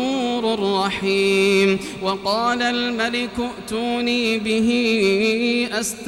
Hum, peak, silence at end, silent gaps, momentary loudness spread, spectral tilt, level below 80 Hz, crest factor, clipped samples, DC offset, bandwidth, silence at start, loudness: none; -6 dBFS; 0 s; none; 7 LU; -4 dB/octave; -52 dBFS; 14 dB; under 0.1%; under 0.1%; 16.5 kHz; 0 s; -20 LUFS